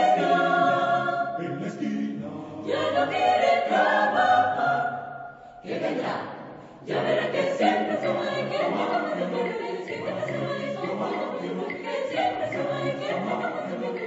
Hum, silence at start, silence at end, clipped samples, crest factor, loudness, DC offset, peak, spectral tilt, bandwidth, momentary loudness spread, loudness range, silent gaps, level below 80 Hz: none; 0 s; 0 s; under 0.1%; 16 dB; -26 LUFS; under 0.1%; -10 dBFS; -5.5 dB/octave; 8 kHz; 11 LU; 6 LU; none; -70 dBFS